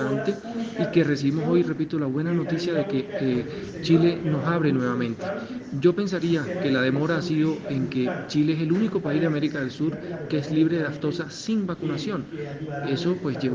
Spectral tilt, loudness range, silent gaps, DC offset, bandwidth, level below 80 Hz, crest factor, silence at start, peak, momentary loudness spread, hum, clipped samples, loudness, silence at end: -7 dB/octave; 3 LU; none; under 0.1%; 7.6 kHz; -60 dBFS; 18 dB; 0 s; -6 dBFS; 9 LU; none; under 0.1%; -25 LUFS; 0 s